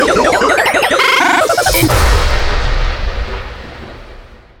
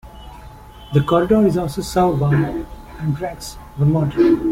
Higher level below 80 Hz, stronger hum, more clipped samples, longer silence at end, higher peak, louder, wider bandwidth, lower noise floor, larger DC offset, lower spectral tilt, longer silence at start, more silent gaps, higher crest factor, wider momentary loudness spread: first, -18 dBFS vs -38 dBFS; neither; neither; first, 0.25 s vs 0 s; about the same, 0 dBFS vs -2 dBFS; first, -12 LUFS vs -18 LUFS; first, over 20 kHz vs 15.5 kHz; second, -35 dBFS vs -39 dBFS; neither; second, -3.5 dB/octave vs -7.5 dB/octave; about the same, 0 s vs 0.05 s; neither; about the same, 12 dB vs 16 dB; about the same, 19 LU vs 17 LU